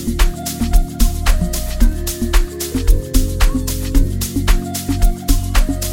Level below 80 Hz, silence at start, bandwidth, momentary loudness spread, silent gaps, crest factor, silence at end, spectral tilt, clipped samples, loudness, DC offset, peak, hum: -16 dBFS; 0 s; 17 kHz; 3 LU; none; 14 dB; 0 s; -4.5 dB/octave; under 0.1%; -19 LUFS; under 0.1%; 0 dBFS; none